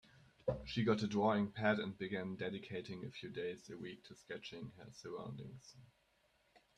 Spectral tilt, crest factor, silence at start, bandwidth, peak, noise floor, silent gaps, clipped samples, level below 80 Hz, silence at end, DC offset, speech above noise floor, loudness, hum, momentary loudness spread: -6.5 dB/octave; 22 dB; 0.15 s; 10 kHz; -20 dBFS; -76 dBFS; none; under 0.1%; -68 dBFS; 0.9 s; under 0.1%; 35 dB; -41 LUFS; none; 17 LU